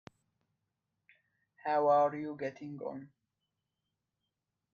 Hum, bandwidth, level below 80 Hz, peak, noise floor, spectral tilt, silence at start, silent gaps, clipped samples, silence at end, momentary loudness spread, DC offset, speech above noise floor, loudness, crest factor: none; 6.8 kHz; -84 dBFS; -18 dBFS; -87 dBFS; -7.5 dB/octave; 1.65 s; none; under 0.1%; 1.7 s; 16 LU; under 0.1%; 55 dB; -33 LUFS; 20 dB